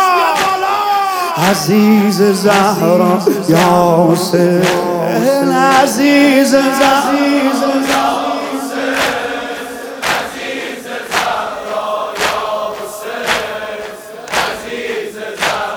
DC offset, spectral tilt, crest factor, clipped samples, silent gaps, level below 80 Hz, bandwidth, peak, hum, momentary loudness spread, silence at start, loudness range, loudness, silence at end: under 0.1%; -4.5 dB/octave; 14 dB; under 0.1%; none; -50 dBFS; 19 kHz; 0 dBFS; none; 12 LU; 0 s; 8 LU; -13 LUFS; 0 s